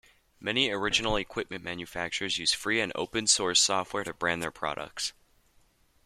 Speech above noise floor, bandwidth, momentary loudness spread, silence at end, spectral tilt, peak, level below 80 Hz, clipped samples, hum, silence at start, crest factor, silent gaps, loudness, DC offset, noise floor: 35 dB; 15.5 kHz; 12 LU; 0.95 s; -1.5 dB/octave; -8 dBFS; -52 dBFS; under 0.1%; none; 0.4 s; 22 dB; none; -28 LUFS; under 0.1%; -65 dBFS